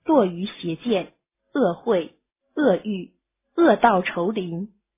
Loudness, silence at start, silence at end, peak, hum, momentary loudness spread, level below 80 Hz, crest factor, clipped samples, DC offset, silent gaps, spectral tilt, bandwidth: -22 LUFS; 0.05 s; 0.3 s; -2 dBFS; none; 15 LU; -62 dBFS; 20 dB; under 0.1%; under 0.1%; none; -10.5 dB/octave; 3.9 kHz